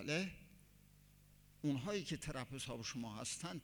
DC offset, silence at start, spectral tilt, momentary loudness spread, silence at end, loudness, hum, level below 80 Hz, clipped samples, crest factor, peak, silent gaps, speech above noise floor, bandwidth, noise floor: under 0.1%; 0 s; -4 dB/octave; 6 LU; 0 s; -44 LUFS; 50 Hz at -65 dBFS; -66 dBFS; under 0.1%; 18 dB; -28 dBFS; none; 23 dB; over 20 kHz; -66 dBFS